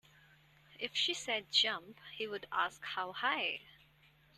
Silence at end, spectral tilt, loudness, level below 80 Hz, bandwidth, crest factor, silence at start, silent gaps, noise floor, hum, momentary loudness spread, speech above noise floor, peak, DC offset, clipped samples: 0.65 s; -1 dB/octave; -35 LUFS; -78 dBFS; 13.5 kHz; 24 dB; 0.7 s; none; -67 dBFS; none; 13 LU; 29 dB; -16 dBFS; under 0.1%; under 0.1%